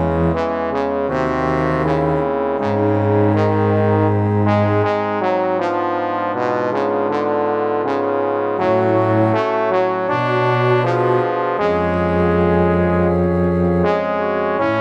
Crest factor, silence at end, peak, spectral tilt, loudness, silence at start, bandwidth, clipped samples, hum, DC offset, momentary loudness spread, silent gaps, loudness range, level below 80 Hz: 14 dB; 0 s; -2 dBFS; -8.5 dB/octave; -17 LUFS; 0 s; 7.8 kHz; under 0.1%; none; under 0.1%; 4 LU; none; 2 LU; -40 dBFS